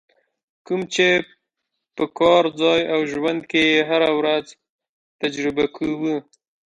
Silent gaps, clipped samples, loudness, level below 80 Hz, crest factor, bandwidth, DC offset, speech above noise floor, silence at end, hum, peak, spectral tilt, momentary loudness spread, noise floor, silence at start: 4.70-4.79 s, 4.89-5.19 s; under 0.1%; -20 LUFS; -58 dBFS; 18 dB; 10.5 kHz; under 0.1%; 60 dB; 0.45 s; none; -4 dBFS; -4.5 dB/octave; 11 LU; -79 dBFS; 0.7 s